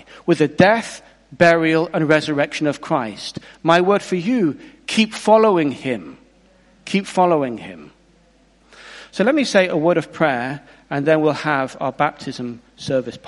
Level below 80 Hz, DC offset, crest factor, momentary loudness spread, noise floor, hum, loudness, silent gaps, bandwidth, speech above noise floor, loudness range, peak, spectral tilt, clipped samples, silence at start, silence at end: -58 dBFS; under 0.1%; 18 dB; 17 LU; -54 dBFS; none; -18 LUFS; none; 11.5 kHz; 37 dB; 4 LU; 0 dBFS; -5.5 dB/octave; under 0.1%; 0.15 s; 0 s